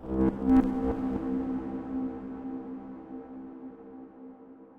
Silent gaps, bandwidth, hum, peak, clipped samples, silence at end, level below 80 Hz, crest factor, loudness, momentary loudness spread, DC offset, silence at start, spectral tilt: none; 3.8 kHz; none; -12 dBFS; under 0.1%; 0 s; -46 dBFS; 18 dB; -30 LUFS; 23 LU; under 0.1%; 0 s; -10 dB/octave